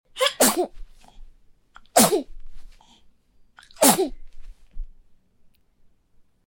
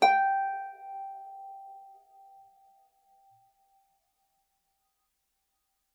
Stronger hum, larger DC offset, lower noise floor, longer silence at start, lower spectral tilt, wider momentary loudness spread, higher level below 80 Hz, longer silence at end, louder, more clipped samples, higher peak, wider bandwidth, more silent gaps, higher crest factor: neither; neither; second, -57 dBFS vs -79 dBFS; first, 0.15 s vs 0 s; about the same, -2 dB/octave vs -1.5 dB/octave; second, 12 LU vs 24 LU; first, -44 dBFS vs under -90 dBFS; second, 1.55 s vs 4.1 s; first, -20 LUFS vs -31 LUFS; neither; first, -2 dBFS vs -10 dBFS; first, 17 kHz vs 12 kHz; neither; about the same, 24 dB vs 26 dB